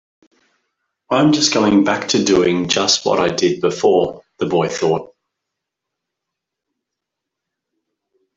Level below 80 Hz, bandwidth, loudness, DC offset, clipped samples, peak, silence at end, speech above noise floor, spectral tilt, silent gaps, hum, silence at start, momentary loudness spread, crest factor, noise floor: -54 dBFS; 8 kHz; -16 LUFS; under 0.1%; under 0.1%; -2 dBFS; 3.3 s; 66 dB; -4 dB/octave; none; none; 1.1 s; 7 LU; 18 dB; -81 dBFS